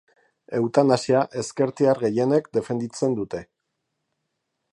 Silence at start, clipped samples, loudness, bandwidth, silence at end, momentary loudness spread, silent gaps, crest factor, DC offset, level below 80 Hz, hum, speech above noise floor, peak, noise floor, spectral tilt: 0.5 s; under 0.1%; -23 LUFS; 11 kHz; 1.3 s; 10 LU; none; 20 dB; under 0.1%; -64 dBFS; none; 56 dB; -4 dBFS; -78 dBFS; -6 dB/octave